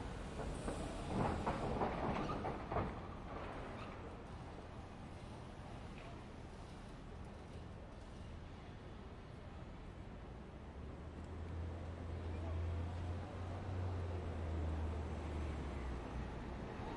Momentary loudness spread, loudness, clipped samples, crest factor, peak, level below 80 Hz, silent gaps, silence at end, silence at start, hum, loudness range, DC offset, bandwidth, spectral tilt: 12 LU; -46 LUFS; under 0.1%; 20 dB; -26 dBFS; -52 dBFS; none; 0 s; 0 s; none; 11 LU; under 0.1%; 11.5 kHz; -7 dB/octave